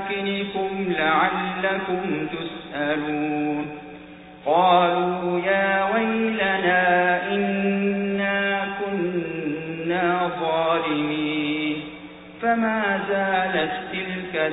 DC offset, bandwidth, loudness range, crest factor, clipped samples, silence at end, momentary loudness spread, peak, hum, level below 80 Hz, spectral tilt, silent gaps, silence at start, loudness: under 0.1%; 4 kHz; 4 LU; 16 dB; under 0.1%; 0 s; 10 LU; -6 dBFS; none; -58 dBFS; -10 dB/octave; none; 0 s; -23 LUFS